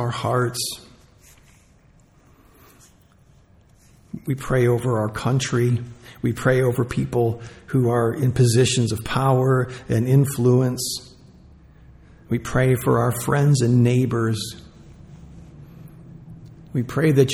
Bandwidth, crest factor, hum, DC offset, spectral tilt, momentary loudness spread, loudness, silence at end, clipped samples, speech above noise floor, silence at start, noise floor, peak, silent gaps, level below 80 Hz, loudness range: 16 kHz; 18 dB; none; under 0.1%; -6 dB/octave; 11 LU; -21 LUFS; 0 s; under 0.1%; 34 dB; 0 s; -54 dBFS; -4 dBFS; none; -48 dBFS; 8 LU